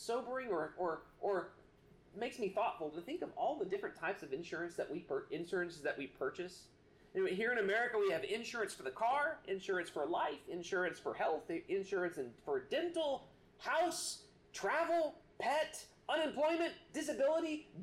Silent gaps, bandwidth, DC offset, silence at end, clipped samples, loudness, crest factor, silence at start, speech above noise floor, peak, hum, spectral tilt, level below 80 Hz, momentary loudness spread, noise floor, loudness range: none; 15.5 kHz; under 0.1%; 0 s; under 0.1%; -39 LUFS; 14 dB; 0 s; 26 dB; -26 dBFS; none; -3.5 dB/octave; -74 dBFS; 9 LU; -65 dBFS; 4 LU